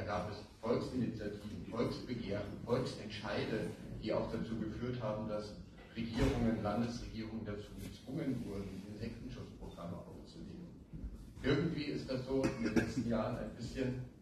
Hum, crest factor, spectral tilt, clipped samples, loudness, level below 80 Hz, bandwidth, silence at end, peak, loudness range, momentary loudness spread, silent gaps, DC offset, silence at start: none; 22 dB; -6.5 dB/octave; under 0.1%; -40 LUFS; -54 dBFS; 13 kHz; 0 s; -18 dBFS; 7 LU; 14 LU; none; under 0.1%; 0 s